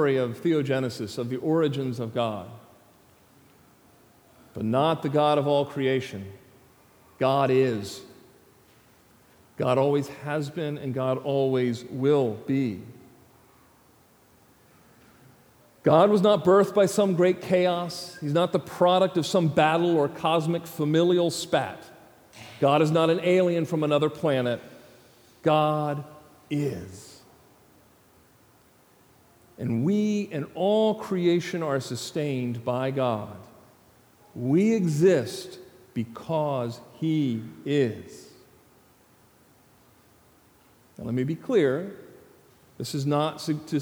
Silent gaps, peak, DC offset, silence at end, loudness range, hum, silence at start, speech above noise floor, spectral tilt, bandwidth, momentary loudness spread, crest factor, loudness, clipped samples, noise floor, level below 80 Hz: none; -4 dBFS; under 0.1%; 0 s; 9 LU; none; 0 s; 34 dB; -6.5 dB/octave; over 20 kHz; 14 LU; 22 dB; -25 LUFS; under 0.1%; -59 dBFS; -68 dBFS